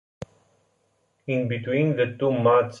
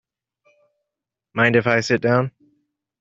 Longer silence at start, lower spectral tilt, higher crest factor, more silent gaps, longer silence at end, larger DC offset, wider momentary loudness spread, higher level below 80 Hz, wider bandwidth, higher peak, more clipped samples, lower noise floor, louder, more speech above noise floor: second, 0.2 s vs 1.35 s; first, -8 dB/octave vs -4.5 dB/octave; about the same, 16 dB vs 20 dB; neither; second, 0 s vs 0.7 s; neither; first, 23 LU vs 12 LU; about the same, -62 dBFS vs -62 dBFS; about the same, 7.4 kHz vs 7.8 kHz; second, -8 dBFS vs -2 dBFS; neither; second, -69 dBFS vs -85 dBFS; second, -23 LUFS vs -19 LUFS; second, 47 dB vs 67 dB